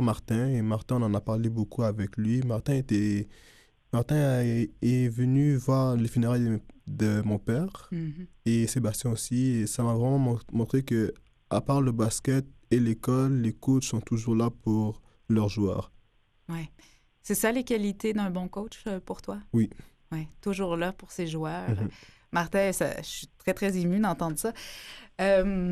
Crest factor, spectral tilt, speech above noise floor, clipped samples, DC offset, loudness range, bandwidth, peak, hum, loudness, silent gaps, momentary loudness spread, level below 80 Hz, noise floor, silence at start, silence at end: 16 dB; -6.5 dB/octave; 36 dB; under 0.1%; under 0.1%; 5 LU; 14.5 kHz; -12 dBFS; none; -28 LUFS; none; 11 LU; -50 dBFS; -63 dBFS; 0 s; 0 s